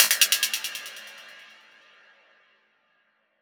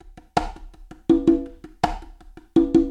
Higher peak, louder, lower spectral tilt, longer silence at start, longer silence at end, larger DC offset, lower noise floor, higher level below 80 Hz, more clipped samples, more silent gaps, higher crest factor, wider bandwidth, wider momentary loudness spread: about the same, 0 dBFS vs -2 dBFS; about the same, -22 LUFS vs -22 LUFS; second, 4.5 dB/octave vs -7 dB/octave; second, 0 s vs 0.35 s; first, 2 s vs 0 s; neither; first, -69 dBFS vs -45 dBFS; second, under -90 dBFS vs -38 dBFS; neither; neither; first, 28 dB vs 20 dB; first, over 20 kHz vs 9.8 kHz; first, 27 LU vs 17 LU